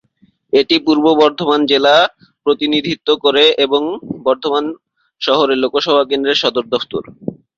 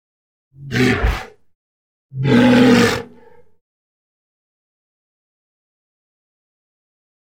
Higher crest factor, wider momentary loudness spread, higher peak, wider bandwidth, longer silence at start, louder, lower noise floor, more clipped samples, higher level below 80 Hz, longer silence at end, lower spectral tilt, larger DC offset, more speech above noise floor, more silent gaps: second, 14 dB vs 20 dB; second, 11 LU vs 15 LU; about the same, 0 dBFS vs 0 dBFS; second, 7.4 kHz vs 16 kHz; about the same, 0.55 s vs 0.6 s; about the same, -14 LUFS vs -15 LUFS; first, -55 dBFS vs -48 dBFS; neither; second, -58 dBFS vs -34 dBFS; second, 0.25 s vs 4.3 s; second, -4.5 dB/octave vs -6 dB/octave; neither; first, 41 dB vs 34 dB; second, none vs 1.55-2.09 s